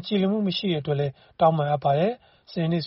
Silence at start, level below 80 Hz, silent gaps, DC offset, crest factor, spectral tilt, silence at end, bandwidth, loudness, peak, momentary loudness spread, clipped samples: 0 s; -62 dBFS; none; under 0.1%; 16 dB; -5.5 dB/octave; 0 s; 6 kHz; -24 LUFS; -8 dBFS; 9 LU; under 0.1%